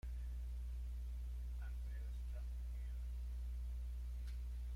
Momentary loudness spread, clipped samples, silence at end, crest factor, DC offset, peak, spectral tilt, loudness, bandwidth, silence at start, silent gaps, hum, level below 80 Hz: 1 LU; under 0.1%; 0 s; 6 dB; under 0.1%; -40 dBFS; -6.5 dB/octave; -49 LUFS; 11.5 kHz; 0.05 s; none; 60 Hz at -45 dBFS; -46 dBFS